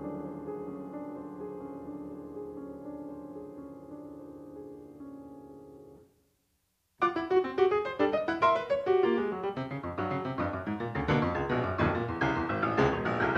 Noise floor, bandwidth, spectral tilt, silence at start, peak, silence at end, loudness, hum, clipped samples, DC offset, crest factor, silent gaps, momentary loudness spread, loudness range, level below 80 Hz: -75 dBFS; 7.6 kHz; -7.5 dB/octave; 0 s; -12 dBFS; 0 s; -31 LUFS; none; under 0.1%; under 0.1%; 20 dB; none; 19 LU; 17 LU; -54 dBFS